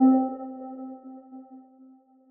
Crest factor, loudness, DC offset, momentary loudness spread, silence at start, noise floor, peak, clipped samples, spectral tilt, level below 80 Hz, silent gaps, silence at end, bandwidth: 16 dB; -29 LUFS; under 0.1%; 24 LU; 0 s; -55 dBFS; -10 dBFS; under 0.1%; -5.5 dB/octave; -74 dBFS; none; 0.75 s; 1.9 kHz